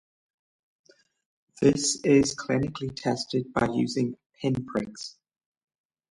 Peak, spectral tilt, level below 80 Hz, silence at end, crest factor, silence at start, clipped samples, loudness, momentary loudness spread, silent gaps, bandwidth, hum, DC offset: -8 dBFS; -5 dB/octave; -56 dBFS; 1 s; 20 dB; 1.6 s; under 0.1%; -26 LUFS; 11 LU; 4.26-4.30 s; 11.5 kHz; none; under 0.1%